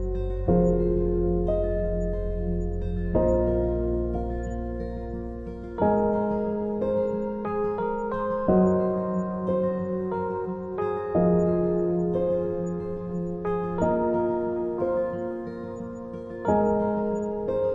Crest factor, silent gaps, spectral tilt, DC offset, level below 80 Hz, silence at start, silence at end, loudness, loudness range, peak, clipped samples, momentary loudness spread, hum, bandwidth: 16 dB; none; -10.5 dB/octave; under 0.1%; -36 dBFS; 0 s; 0 s; -26 LUFS; 2 LU; -10 dBFS; under 0.1%; 10 LU; none; 7.4 kHz